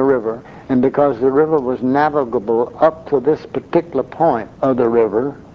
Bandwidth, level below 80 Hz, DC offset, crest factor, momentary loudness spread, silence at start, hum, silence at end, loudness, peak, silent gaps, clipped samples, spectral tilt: 6.4 kHz; -50 dBFS; under 0.1%; 16 dB; 5 LU; 0 s; none; 0.15 s; -17 LUFS; 0 dBFS; none; under 0.1%; -9 dB/octave